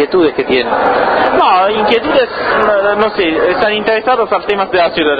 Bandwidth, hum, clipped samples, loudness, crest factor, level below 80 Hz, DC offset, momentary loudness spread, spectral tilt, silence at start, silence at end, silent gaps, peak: 5 kHz; none; under 0.1%; -11 LUFS; 12 dB; -42 dBFS; under 0.1%; 3 LU; -7 dB/octave; 0 s; 0 s; none; 0 dBFS